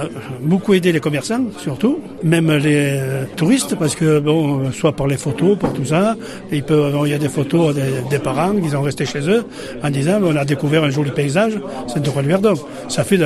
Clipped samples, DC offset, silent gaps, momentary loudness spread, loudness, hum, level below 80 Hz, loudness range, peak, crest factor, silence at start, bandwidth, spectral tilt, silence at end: under 0.1%; under 0.1%; none; 7 LU; -17 LUFS; none; -48 dBFS; 1 LU; -2 dBFS; 16 dB; 0 s; 13 kHz; -6 dB/octave; 0 s